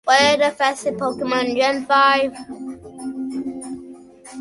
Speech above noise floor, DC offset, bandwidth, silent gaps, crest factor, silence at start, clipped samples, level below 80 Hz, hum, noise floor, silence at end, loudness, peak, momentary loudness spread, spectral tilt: 22 dB; under 0.1%; 11.5 kHz; none; 18 dB; 0.05 s; under 0.1%; -58 dBFS; none; -40 dBFS; 0 s; -19 LUFS; -2 dBFS; 19 LU; -2.5 dB/octave